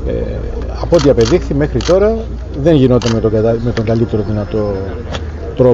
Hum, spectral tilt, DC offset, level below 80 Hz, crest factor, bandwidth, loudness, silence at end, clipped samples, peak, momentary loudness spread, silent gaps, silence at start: none; -7 dB/octave; under 0.1%; -24 dBFS; 12 dB; 8 kHz; -14 LUFS; 0 s; under 0.1%; 0 dBFS; 12 LU; none; 0 s